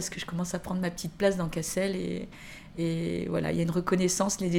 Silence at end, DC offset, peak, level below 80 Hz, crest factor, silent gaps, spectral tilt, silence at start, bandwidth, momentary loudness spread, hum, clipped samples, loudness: 0 s; under 0.1%; -10 dBFS; -52 dBFS; 18 dB; none; -5 dB/octave; 0 s; 16.5 kHz; 9 LU; none; under 0.1%; -30 LUFS